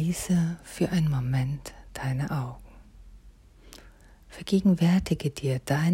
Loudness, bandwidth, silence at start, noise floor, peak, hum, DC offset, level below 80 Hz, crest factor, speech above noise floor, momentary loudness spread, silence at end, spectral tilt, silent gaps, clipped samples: -27 LUFS; 16 kHz; 0 s; -52 dBFS; -12 dBFS; none; under 0.1%; -48 dBFS; 16 dB; 27 dB; 15 LU; 0 s; -6.5 dB/octave; none; under 0.1%